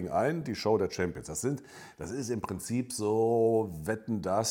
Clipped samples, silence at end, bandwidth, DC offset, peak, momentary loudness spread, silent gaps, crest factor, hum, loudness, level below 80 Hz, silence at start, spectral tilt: under 0.1%; 0 s; 17 kHz; under 0.1%; -14 dBFS; 11 LU; none; 16 dB; none; -31 LUFS; -62 dBFS; 0 s; -5 dB/octave